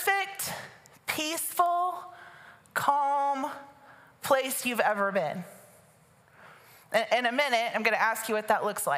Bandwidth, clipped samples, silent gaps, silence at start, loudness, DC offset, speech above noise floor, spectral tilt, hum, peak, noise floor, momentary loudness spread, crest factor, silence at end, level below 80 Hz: 16 kHz; under 0.1%; none; 0 s; -28 LUFS; under 0.1%; 33 dB; -2 dB/octave; none; -10 dBFS; -60 dBFS; 15 LU; 20 dB; 0 s; -80 dBFS